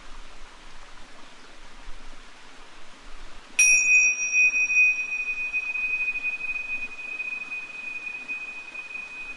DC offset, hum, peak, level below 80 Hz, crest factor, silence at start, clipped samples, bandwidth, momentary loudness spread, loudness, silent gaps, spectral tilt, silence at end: under 0.1%; none; -8 dBFS; -48 dBFS; 20 dB; 0 s; under 0.1%; 11.5 kHz; 16 LU; -22 LUFS; none; 2 dB/octave; 0 s